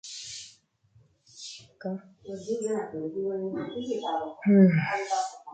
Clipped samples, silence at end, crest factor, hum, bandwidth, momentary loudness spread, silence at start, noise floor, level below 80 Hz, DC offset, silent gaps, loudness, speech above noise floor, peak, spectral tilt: under 0.1%; 0 s; 20 dB; none; 9.2 kHz; 21 LU; 0.05 s; -63 dBFS; -70 dBFS; under 0.1%; none; -27 LUFS; 36 dB; -8 dBFS; -6.5 dB/octave